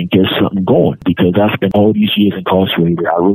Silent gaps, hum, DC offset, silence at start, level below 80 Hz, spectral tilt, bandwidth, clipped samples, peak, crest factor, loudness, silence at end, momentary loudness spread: none; none; under 0.1%; 0 s; -44 dBFS; -9.5 dB/octave; 14 kHz; under 0.1%; 0 dBFS; 12 dB; -12 LUFS; 0 s; 2 LU